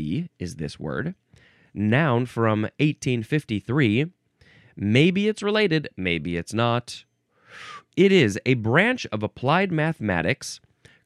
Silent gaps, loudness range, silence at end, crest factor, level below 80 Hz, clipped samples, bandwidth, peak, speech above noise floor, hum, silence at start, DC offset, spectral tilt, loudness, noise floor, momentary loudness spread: none; 3 LU; 0.5 s; 18 dB; -56 dBFS; under 0.1%; 12.5 kHz; -4 dBFS; 33 dB; none; 0 s; under 0.1%; -6 dB/octave; -23 LUFS; -56 dBFS; 14 LU